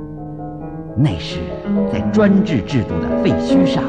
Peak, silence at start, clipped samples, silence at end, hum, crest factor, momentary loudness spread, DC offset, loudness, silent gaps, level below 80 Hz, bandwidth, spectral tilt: -4 dBFS; 0 s; under 0.1%; 0 s; none; 14 dB; 16 LU; under 0.1%; -17 LUFS; none; -36 dBFS; 9.2 kHz; -7.5 dB/octave